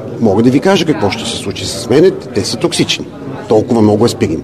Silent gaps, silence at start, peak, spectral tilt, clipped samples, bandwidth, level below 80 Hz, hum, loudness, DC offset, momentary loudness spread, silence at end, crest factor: none; 0 s; 0 dBFS; -5 dB/octave; 0.2%; 14 kHz; -42 dBFS; none; -12 LUFS; 0.3%; 9 LU; 0 s; 12 dB